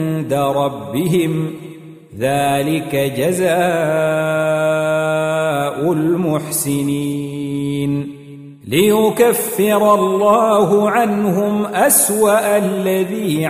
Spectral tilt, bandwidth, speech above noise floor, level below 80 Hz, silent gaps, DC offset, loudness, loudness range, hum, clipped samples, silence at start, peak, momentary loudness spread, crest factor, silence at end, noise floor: -5 dB/octave; 16 kHz; 20 dB; -56 dBFS; none; under 0.1%; -16 LUFS; 5 LU; none; under 0.1%; 0 s; 0 dBFS; 9 LU; 16 dB; 0 s; -36 dBFS